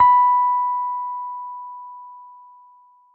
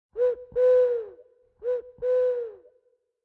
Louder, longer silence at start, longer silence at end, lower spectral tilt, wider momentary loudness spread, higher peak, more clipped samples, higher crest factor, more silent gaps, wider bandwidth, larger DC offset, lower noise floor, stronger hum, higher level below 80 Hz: first, -20 LUFS vs -25 LUFS; second, 0 s vs 0.15 s; first, 0.85 s vs 0.7 s; second, -4 dB/octave vs -5.5 dB/octave; first, 23 LU vs 15 LU; first, -6 dBFS vs -14 dBFS; neither; about the same, 14 dB vs 12 dB; neither; about the same, 4.2 kHz vs 4.1 kHz; neither; second, -52 dBFS vs -68 dBFS; neither; about the same, -68 dBFS vs -64 dBFS